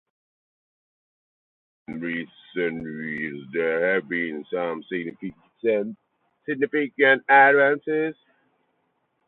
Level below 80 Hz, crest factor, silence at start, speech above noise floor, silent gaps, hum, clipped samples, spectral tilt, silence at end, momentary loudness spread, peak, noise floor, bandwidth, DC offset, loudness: -70 dBFS; 22 dB; 1.9 s; 49 dB; none; none; under 0.1%; -8.5 dB/octave; 1.15 s; 18 LU; -4 dBFS; -72 dBFS; 4.2 kHz; under 0.1%; -23 LUFS